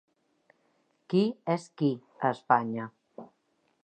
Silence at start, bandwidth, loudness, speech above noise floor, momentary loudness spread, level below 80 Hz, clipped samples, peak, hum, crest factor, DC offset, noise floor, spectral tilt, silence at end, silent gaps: 1.1 s; 9 kHz; -29 LUFS; 45 dB; 21 LU; -82 dBFS; under 0.1%; -8 dBFS; none; 24 dB; under 0.1%; -73 dBFS; -7.5 dB/octave; 0.6 s; none